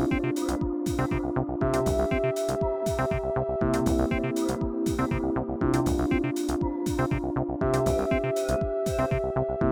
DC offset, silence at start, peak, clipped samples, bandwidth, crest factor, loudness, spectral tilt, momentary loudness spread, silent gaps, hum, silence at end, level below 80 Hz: under 0.1%; 0 s; -10 dBFS; under 0.1%; over 20 kHz; 18 dB; -27 LUFS; -6.5 dB/octave; 3 LU; none; none; 0 s; -38 dBFS